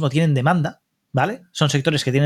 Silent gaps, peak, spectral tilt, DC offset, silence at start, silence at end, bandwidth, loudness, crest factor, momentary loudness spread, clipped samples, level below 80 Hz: none; -2 dBFS; -5.5 dB/octave; under 0.1%; 0 s; 0 s; 13 kHz; -20 LUFS; 16 dB; 7 LU; under 0.1%; -58 dBFS